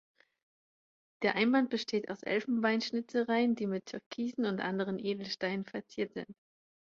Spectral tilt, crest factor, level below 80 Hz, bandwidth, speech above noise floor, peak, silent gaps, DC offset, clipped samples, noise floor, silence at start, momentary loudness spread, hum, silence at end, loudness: -5.5 dB/octave; 22 dB; -78 dBFS; 7.4 kHz; over 57 dB; -14 dBFS; 4.06-4.11 s; under 0.1%; under 0.1%; under -90 dBFS; 1.2 s; 10 LU; none; 0.6 s; -33 LUFS